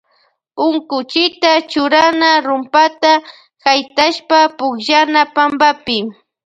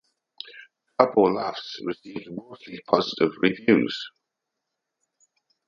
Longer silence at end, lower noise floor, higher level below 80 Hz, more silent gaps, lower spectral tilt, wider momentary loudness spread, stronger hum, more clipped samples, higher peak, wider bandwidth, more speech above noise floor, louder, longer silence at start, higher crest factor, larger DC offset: second, 0.35 s vs 1.6 s; second, -59 dBFS vs -83 dBFS; first, -60 dBFS vs -68 dBFS; neither; second, -2.5 dB/octave vs -6 dB/octave; second, 8 LU vs 21 LU; neither; neither; about the same, 0 dBFS vs 0 dBFS; first, 8.8 kHz vs 7.4 kHz; second, 46 dB vs 59 dB; first, -13 LUFS vs -23 LUFS; about the same, 0.55 s vs 0.45 s; second, 14 dB vs 26 dB; neither